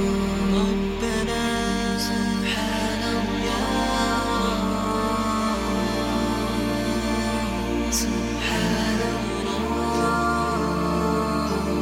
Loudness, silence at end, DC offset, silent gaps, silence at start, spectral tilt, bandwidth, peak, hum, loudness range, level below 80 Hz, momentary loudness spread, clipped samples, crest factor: -24 LUFS; 0 s; under 0.1%; none; 0 s; -4.5 dB/octave; 16.5 kHz; -10 dBFS; none; 1 LU; -36 dBFS; 3 LU; under 0.1%; 14 dB